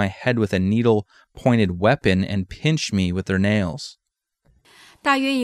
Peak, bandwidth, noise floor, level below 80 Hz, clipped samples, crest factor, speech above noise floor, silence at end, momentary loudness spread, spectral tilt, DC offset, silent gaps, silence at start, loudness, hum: -4 dBFS; 13 kHz; -66 dBFS; -48 dBFS; under 0.1%; 16 dB; 45 dB; 0 s; 7 LU; -6 dB/octave; under 0.1%; none; 0 s; -21 LUFS; none